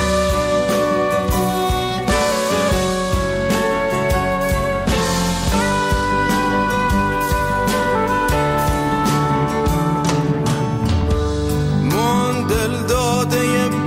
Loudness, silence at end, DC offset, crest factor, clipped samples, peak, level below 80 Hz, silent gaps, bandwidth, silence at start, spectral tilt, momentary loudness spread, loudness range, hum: -18 LUFS; 0 s; under 0.1%; 10 dB; under 0.1%; -6 dBFS; -28 dBFS; none; 16.5 kHz; 0 s; -5 dB/octave; 2 LU; 1 LU; none